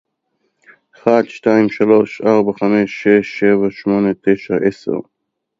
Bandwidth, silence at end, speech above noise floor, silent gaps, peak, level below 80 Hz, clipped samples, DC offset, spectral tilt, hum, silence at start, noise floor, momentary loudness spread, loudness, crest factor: 7.4 kHz; 0.6 s; 54 dB; none; 0 dBFS; -56 dBFS; under 0.1%; under 0.1%; -7.5 dB/octave; none; 1.05 s; -68 dBFS; 5 LU; -15 LUFS; 16 dB